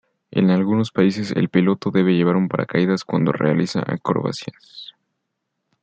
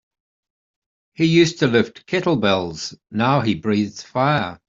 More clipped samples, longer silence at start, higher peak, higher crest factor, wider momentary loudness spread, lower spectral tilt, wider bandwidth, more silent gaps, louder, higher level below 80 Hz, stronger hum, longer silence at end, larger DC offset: neither; second, 0.35 s vs 1.2 s; about the same, -4 dBFS vs -2 dBFS; about the same, 16 dB vs 18 dB; first, 15 LU vs 9 LU; first, -7.5 dB/octave vs -5.5 dB/octave; about the same, 8.2 kHz vs 7.8 kHz; neither; about the same, -19 LUFS vs -19 LUFS; about the same, -60 dBFS vs -56 dBFS; neither; first, 0.95 s vs 0.15 s; neither